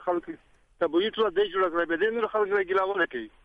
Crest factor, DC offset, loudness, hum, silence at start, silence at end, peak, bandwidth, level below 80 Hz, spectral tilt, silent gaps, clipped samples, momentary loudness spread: 14 dB; under 0.1%; -26 LUFS; none; 0 s; 0.15 s; -12 dBFS; 5.2 kHz; -62 dBFS; -6 dB/octave; none; under 0.1%; 6 LU